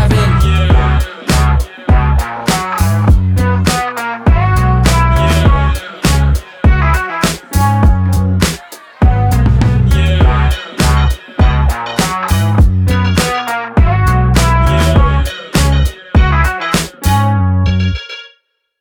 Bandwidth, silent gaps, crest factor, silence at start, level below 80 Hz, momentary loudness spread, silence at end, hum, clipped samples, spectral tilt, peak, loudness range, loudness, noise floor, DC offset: 19.5 kHz; none; 10 dB; 0 s; -14 dBFS; 5 LU; 0.55 s; none; under 0.1%; -5.5 dB/octave; 0 dBFS; 1 LU; -12 LUFS; -54 dBFS; under 0.1%